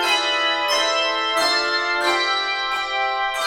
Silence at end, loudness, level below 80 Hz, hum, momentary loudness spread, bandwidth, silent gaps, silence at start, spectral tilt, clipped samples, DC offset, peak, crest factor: 0 s; -19 LUFS; -56 dBFS; none; 4 LU; over 20 kHz; none; 0 s; 0.5 dB/octave; under 0.1%; under 0.1%; -6 dBFS; 14 dB